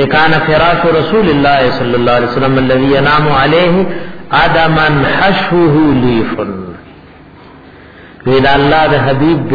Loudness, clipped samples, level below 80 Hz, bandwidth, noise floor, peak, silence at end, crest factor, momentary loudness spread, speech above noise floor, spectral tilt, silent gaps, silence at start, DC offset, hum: -10 LUFS; under 0.1%; -30 dBFS; 5.4 kHz; -36 dBFS; 0 dBFS; 0 s; 10 dB; 6 LU; 27 dB; -8.5 dB/octave; none; 0 s; under 0.1%; none